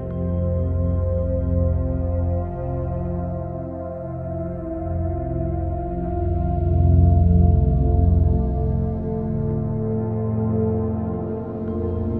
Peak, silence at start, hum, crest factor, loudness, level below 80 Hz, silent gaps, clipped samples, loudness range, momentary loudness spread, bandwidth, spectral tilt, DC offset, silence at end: -6 dBFS; 0 s; none; 16 dB; -22 LUFS; -26 dBFS; none; under 0.1%; 8 LU; 11 LU; 2.2 kHz; -14 dB/octave; 0.2%; 0 s